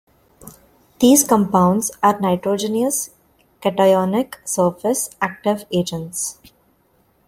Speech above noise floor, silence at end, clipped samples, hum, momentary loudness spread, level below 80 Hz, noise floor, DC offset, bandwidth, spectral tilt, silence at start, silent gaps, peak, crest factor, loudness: 42 dB; 0.95 s; under 0.1%; none; 11 LU; -56 dBFS; -60 dBFS; under 0.1%; 16.5 kHz; -4.5 dB/octave; 0.45 s; none; 0 dBFS; 20 dB; -18 LUFS